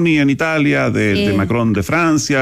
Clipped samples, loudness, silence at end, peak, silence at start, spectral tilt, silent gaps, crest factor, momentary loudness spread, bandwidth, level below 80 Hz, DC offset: under 0.1%; -15 LUFS; 0 s; -6 dBFS; 0 s; -5.5 dB/octave; none; 10 dB; 2 LU; 15 kHz; -44 dBFS; under 0.1%